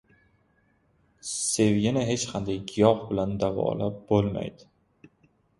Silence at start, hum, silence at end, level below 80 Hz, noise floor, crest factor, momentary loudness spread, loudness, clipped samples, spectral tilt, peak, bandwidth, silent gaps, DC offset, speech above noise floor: 1.25 s; none; 1.05 s; -54 dBFS; -67 dBFS; 22 dB; 10 LU; -26 LUFS; under 0.1%; -5 dB/octave; -4 dBFS; 12 kHz; none; under 0.1%; 41 dB